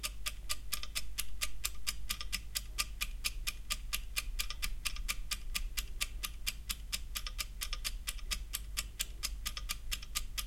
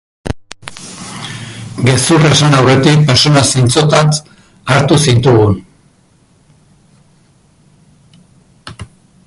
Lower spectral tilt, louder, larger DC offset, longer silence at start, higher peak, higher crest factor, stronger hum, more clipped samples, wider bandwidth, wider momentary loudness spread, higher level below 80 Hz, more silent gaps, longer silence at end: second, -0.5 dB/octave vs -5 dB/octave; second, -39 LUFS vs -9 LUFS; neither; second, 0 s vs 0.25 s; second, -14 dBFS vs 0 dBFS; first, 24 dB vs 12 dB; neither; neither; first, 17 kHz vs 11.5 kHz; second, 4 LU vs 19 LU; second, -44 dBFS vs -38 dBFS; neither; second, 0 s vs 0.45 s